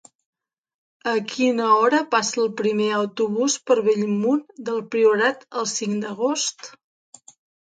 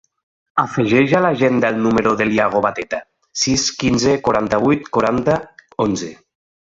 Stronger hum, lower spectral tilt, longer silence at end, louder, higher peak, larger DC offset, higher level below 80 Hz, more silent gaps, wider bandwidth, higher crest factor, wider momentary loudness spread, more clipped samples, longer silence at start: neither; about the same, -3.5 dB/octave vs -4.5 dB/octave; first, 0.95 s vs 0.6 s; second, -21 LUFS vs -17 LUFS; second, -6 dBFS vs -2 dBFS; neither; second, -74 dBFS vs -46 dBFS; neither; first, 9.4 kHz vs 8 kHz; about the same, 18 dB vs 16 dB; about the same, 9 LU vs 10 LU; neither; first, 1.05 s vs 0.55 s